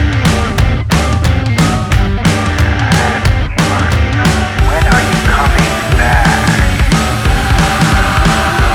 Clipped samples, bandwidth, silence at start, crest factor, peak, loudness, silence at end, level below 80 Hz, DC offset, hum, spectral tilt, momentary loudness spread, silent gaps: under 0.1%; 18 kHz; 0 s; 10 dB; 0 dBFS; -11 LUFS; 0 s; -16 dBFS; under 0.1%; none; -5 dB/octave; 3 LU; none